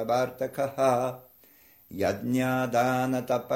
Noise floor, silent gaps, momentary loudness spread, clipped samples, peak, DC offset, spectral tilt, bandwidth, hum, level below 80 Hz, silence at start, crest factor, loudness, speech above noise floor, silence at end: -57 dBFS; none; 7 LU; under 0.1%; -10 dBFS; under 0.1%; -6 dB/octave; 16.5 kHz; none; -64 dBFS; 0 s; 18 dB; -27 LUFS; 31 dB; 0 s